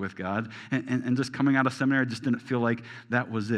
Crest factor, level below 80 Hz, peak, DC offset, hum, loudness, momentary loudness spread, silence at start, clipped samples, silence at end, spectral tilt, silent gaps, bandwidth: 20 dB; -72 dBFS; -8 dBFS; under 0.1%; none; -28 LUFS; 8 LU; 0 s; under 0.1%; 0 s; -6.5 dB/octave; none; 10.5 kHz